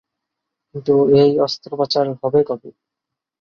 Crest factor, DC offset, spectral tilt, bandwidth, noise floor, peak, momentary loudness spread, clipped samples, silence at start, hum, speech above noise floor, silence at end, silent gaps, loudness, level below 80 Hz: 16 dB; under 0.1%; -7 dB/octave; 6.8 kHz; -83 dBFS; -2 dBFS; 14 LU; under 0.1%; 0.75 s; none; 67 dB; 0.7 s; none; -17 LUFS; -60 dBFS